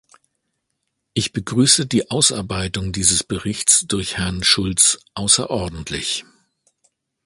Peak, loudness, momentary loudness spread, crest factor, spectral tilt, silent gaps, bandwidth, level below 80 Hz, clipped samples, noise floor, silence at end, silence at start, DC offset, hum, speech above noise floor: 0 dBFS; -17 LUFS; 11 LU; 20 dB; -2.5 dB/octave; none; 12.5 kHz; -42 dBFS; under 0.1%; -75 dBFS; 1.05 s; 1.15 s; under 0.1%; none; 56 dB